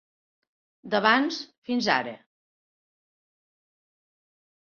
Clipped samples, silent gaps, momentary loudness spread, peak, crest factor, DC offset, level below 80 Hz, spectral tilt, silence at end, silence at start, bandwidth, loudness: under 0.1%; 1.58-1.62 s; 12 LU; -6 dBFS; 24 dB; under 0.1%; -74 dBFS; -4 dB/octave; 2.5 s; 0.85 s; 7 kHz; -25 LUFS